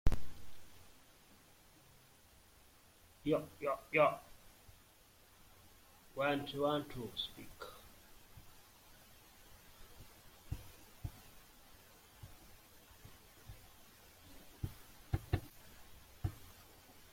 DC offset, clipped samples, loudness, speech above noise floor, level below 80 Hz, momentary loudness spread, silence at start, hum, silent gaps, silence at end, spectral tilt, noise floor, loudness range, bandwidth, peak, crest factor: under 0.1%; under 0.1%; -40 LUFS; 28 dB; -52 dBFS; 26 LU; 0.05 s; none; none; 0.6 s; -5.5 dB/octave; -65 dBFS; 17 LU; 16.5 kHz; -16 dBFS; 26 dB